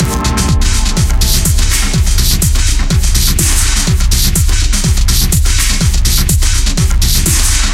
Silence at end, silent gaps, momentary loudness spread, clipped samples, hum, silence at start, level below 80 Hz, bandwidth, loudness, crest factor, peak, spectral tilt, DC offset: 0 s; none; 2 LU; under 0.1%; none; 0 s; -12 dBFS; 16.5 kHz; -11 LUFS; 10 dB; 0 dBFS; -3 dB/octave; under 0.1%